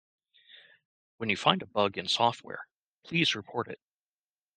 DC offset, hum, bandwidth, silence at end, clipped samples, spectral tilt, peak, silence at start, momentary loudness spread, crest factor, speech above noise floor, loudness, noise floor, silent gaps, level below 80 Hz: under 0.1%; none; 9.6 kHz; 0.8 s; under 0.1%; -4 dB/octave; -6 dBFS; 0.55 s; 16 LU; 26 dB; over 60 dB; -29 LUFS; under -90 dBFS; 0.85-1.18 s, 2.76-3.02 s; -72 dBFS